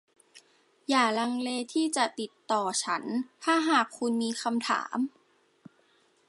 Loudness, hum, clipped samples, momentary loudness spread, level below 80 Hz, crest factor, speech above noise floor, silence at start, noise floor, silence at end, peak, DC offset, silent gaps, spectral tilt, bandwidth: -29 LUFS; none; under 0.1%; 8 LU; -84 dBFS; 22 dB; 38 dB; 0.35 s; -66 dBFS; 1.2 s; -8 dBFS; under 0.1%; none; -2.5 dB/octave; 11.5 kHz